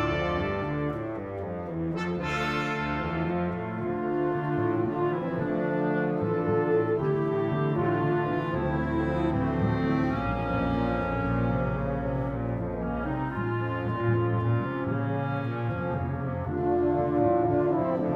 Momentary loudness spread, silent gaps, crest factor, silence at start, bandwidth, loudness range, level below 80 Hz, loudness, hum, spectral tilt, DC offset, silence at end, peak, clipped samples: 6 LU; none; 16 dB; 0 s; 7.4 kHz; 3 LU; -44 dBFS; -28 LUFS; none; -8.5 dB/octave; under 0.1%; 0 s; -12 dBFS; under 0.1%